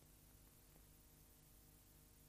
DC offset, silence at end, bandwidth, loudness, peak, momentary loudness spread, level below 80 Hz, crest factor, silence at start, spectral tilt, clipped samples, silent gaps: under 0.1%; 0 s; 15.5 kHz; -67 LUFS; -52 dBFS; 0 LU; -72 dBFS; 16 dB; 0 s; -3.5 dB/octave; under 0.1%; none